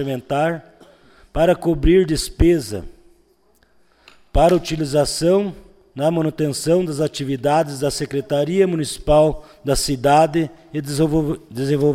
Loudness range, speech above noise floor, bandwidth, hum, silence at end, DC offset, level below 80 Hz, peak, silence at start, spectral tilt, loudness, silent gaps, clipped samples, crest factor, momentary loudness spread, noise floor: 2 LU; 40 dB; 16 kHz; none; 0 s; under 0.1%; -32 dBFS; -4 dBFS; 0 s; -5.5 dB/octave; -19 LUFS; none; under 0.1%; 16 dB; 10 LU; -58 dBFS